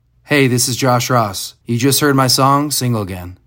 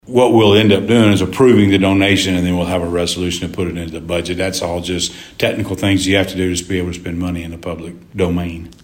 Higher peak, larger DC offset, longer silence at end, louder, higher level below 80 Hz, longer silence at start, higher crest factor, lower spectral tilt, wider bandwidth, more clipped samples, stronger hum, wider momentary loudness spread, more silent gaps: about the same, 0 dBFS vs 0 dBFS; neither; about the same, 0.1 s vs 0.1 s; about the same, -14 LUFS vs -15 LUFS; second, -50 dBFS vs -40 dBFS; first, 0.3 s vs 0.05 s; about the same, 14 dB vs 14 dB; about the same, -4 dB/octave vs -5 dB/octave; about the same, 16.5 kHz vs 16.5 kHz; neither; neither; about the same, 10 LU vs 12 LU; neither